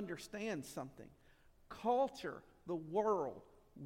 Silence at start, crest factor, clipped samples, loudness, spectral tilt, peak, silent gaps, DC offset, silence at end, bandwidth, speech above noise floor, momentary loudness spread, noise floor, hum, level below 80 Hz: 0 s; 18 dB; under 0.1%; -41 LUFS; -5.5 dB/octave; -24 dBFS; none; under 0.1%; 0 s; 16.5 kHz; 21 dB; 21 LU; -62 dBFS; none; -70 dBFS